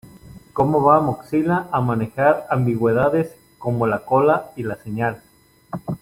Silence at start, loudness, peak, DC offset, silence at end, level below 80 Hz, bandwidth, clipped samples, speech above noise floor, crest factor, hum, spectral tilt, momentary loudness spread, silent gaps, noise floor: 0.15 s; -20 LUFS; -2 dBFS; under 0.1%; 0.05 s; -52 dBFS; 16 kHz; under 0.1%; 24 dB; 18 dB; none; -9 dB/octave; 13 LU; none; -43 dBFS